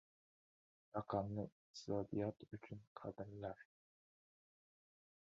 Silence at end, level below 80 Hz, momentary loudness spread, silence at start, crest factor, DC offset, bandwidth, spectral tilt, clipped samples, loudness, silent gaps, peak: 1.6 s; -72 dBFS; 12 LU; 0.95 s; 24 dB; under 0.1%; 7 kHz; -7 dB/octave; under 0.1%; -48 LUFS; 1.52-1.74 s, 2.87-2.95 s; -26 dBFS